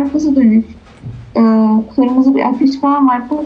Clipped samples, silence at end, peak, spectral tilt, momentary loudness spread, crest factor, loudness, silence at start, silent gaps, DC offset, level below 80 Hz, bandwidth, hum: under 0.1%; 0 s; -2 dBFS; -8 dB/octave; 18 LU; 10 dB; -12 LUFS; 0 s; none; under 0.1%; -44 dBFS; 6.8 kHz; none